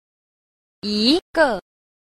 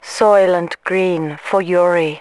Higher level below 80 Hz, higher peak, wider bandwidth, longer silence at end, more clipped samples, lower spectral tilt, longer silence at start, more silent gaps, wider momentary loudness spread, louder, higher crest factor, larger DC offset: first, -52 dBFS vs -64 dBFS; about the same, -2 dBFS vs 0 dBFS; first, 14.5 kHz vs 12 kHz; first, 0.5 s vs 0 s; neither; second, -4 dB/octave vs -5.5 dB/octave; first, 0.85 s vs 0.05 s; first, 1.22-1.34 s vs none; first, 13 LU vs 7 LU; second, -19 LUFS vs -15 LUFS; first, 20 dB vs 14 dB; second, under 0.1% vs 0.1%